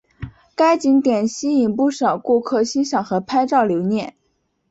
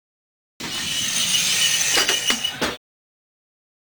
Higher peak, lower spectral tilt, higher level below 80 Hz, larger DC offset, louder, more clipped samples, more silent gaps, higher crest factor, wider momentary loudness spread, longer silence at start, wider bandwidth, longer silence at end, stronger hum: about the same, -4 dBFS vs -2 dBFS; first, -5.5 dB/octave vs 0.5 dB/octave; about the same, -54 dBFS vs -56 dBFS; neither; about the same, -18 LUFS vs -19 LUFS; neither; neither; second, 14 dB vs 22 dB; second, 9 LU vs 12 LU; second, 0.2 s vs 0.6 s; second, 8 kHz vs 19.5 kHz; second, 0.6 s vs 1.15 s; neither